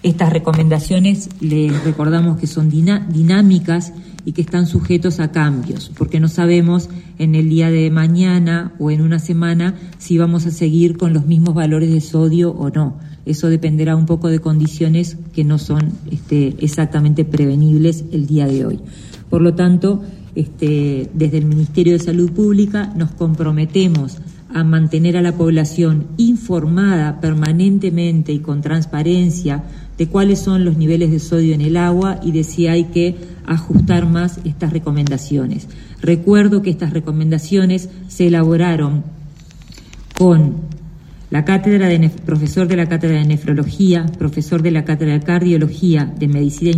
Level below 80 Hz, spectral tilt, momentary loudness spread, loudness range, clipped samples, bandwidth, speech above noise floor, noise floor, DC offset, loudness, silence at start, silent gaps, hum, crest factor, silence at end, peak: -40 dBFS; -7.5 dB/octave; 8 LU; 2 LU; under 0.1%; 10.5 kHz; 23 dB; -37 dBFS; under 0.1%; -15 LUFS; 0.05 s; none; none; 14 dB; 0 s; -2 dBFS